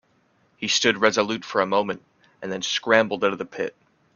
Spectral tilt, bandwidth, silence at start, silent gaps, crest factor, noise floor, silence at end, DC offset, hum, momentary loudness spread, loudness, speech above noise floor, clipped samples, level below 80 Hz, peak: -2.5 dB/octave; 7.4 kHz; 0.6 s; none; 24 dB; -64 dBFS; 0.45 s; under 0.1%; none; 13 LU; -23 LUFS; 41 dB; under 0.1%; -66 dBFS; -2 dBFS